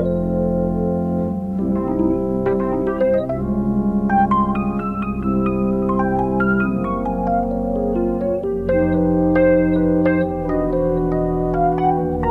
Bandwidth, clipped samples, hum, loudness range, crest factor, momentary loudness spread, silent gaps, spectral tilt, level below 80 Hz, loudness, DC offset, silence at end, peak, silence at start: 4.2 kHz; under 0.1%; none; 2 LU; 14 dB; 5 LU; none; -10.5 dB/octave; -34 dBFS; -19 LUFS; under 0.1%; 0 s; -4 dBFS; 0 s